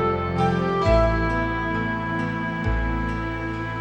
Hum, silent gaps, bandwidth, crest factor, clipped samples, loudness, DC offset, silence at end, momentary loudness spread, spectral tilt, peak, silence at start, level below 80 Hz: none; none; 8.8 kHz; 16 dB; under 0.1%; -23 LUFS; under 0.1%; 0 s; 8 LU; -7.5 dB/octave; -8 dBFS; 0 s; -30 dBFS